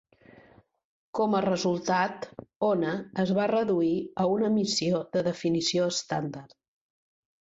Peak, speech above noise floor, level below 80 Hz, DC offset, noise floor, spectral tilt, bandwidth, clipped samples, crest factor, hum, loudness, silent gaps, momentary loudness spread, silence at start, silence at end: -12 dBFS; 31 dB; -66 dBFS; under 0.1%; -58 dBFS; -5 dB/octave; 8.2 kHz; under 0.1%; 18 dB; none; -27 LUFS; 2.56-2.60 s; 7 LU; 1.15 s; 0.95 s